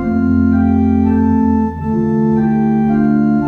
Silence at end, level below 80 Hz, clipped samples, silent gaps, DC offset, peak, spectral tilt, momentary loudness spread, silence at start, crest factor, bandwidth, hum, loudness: 0 s; -32 dBFS; under 0.1%; none; under 0.1%; -2 dBFS; -11 dB/octave; 3 LU; 0 s; 10 dB; 4.1 kHz; none; -13 LUFS